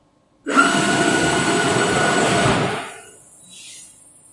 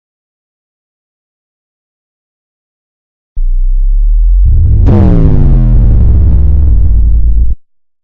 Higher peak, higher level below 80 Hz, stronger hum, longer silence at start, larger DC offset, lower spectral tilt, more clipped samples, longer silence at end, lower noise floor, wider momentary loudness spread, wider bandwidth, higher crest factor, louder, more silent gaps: about the same, -2 dBFS vs 0 dBFS; second, -50 dBFS vs -8 dBFS; neither; second, 0.45 s vs 3.35 s; neither; second, -3.5 dB/octave vs -12 dB/octave; second, under 0.1% vs 5%; about the same, 0.45 s vs 0.45 s; first, -46 dBFS vs -32 dBFS; first, 21 LU vs 10 LU; first, 11.5 kHz vs 2.3 kHz; first, 18 dB vs 8 dB; second, -17 LUFS vs -10 LUFS; neither